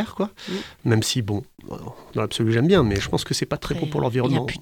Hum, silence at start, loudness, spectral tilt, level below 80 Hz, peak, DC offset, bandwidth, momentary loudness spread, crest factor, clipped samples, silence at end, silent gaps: none; 0 s; -23 LUFS; -5.5 dB/octave; -44 dBFS; -6 dBFS; under 0.1%; 17.5 kHz; 13 LU; 18 dB; under 0.1%; 0 s; none